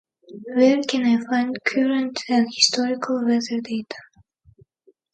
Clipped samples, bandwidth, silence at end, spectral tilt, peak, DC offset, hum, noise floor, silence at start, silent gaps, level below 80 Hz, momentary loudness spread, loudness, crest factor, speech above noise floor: under 0.1%; 9.2 kHz; 1.1 s; -3 dB/octave; -2 dBFS; under 0.1%; none; -60 dBFS; 0.3 s; none; -70 dBFS; 12 LU; -21 LUFS; 20 dB; 40 dB